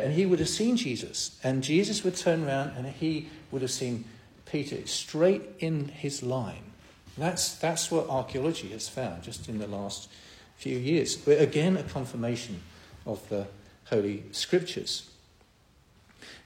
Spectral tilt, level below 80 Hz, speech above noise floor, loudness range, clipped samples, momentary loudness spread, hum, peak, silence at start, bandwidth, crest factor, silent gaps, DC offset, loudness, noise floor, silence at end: -4.5 dB/octave; -60 dBFS; 32 dB; 4 LU; under 0.1%; 14 LU; none; -10 dBFS; 0 s; 16.5 kHz; 20 dB; none; under 0.1%; -30 LUFS; -61 dBFS; 0.05 s